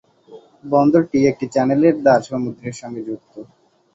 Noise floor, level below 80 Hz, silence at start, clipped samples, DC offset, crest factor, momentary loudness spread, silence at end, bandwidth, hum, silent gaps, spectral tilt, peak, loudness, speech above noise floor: -44 dBFS; -58 dBFS; 0.3 s; under 0.1%; under 0.1%; 16 dB; 16 LU; 0.5 s; 8 kHz; none; none; -7 dB/octave; -2 dBFS; -17 LUFS; 27 dB